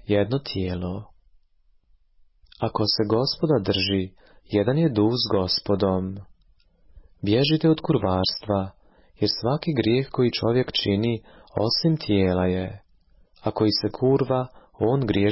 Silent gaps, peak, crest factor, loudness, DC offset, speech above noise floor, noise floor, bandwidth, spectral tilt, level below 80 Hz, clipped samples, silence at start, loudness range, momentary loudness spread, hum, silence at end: none; -8 dBFS; 14 dB; -23 LUFS; under 0.1%; 38 dB; -61 dBFS; 5.8 kHz; -9.5 dB/octave; -46 dBFS; under 0.1%; 0.1 s; 3 LU; 10 LU; none; 0 s